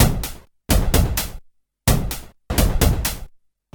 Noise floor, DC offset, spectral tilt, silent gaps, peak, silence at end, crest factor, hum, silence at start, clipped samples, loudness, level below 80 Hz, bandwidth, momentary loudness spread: -48 dBFS; under 0.1%; -4.5 dB/octave; none; -2 dBFS; 0.45 s; 18 dB; none; 0 s; under 0.1%; -21 LUFS; -24 dBFS; 19.5 kHz; 14 LU